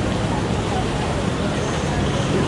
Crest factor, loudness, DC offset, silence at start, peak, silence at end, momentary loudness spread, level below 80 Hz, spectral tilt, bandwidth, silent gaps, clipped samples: 12 dB; -22 LUFS; under 0.1%; 0 s; -8 dBFS; 0 s; 1 LU; -32 dBFS; -5.5 dB/octave; 11.5 kHz; none; under 0.1%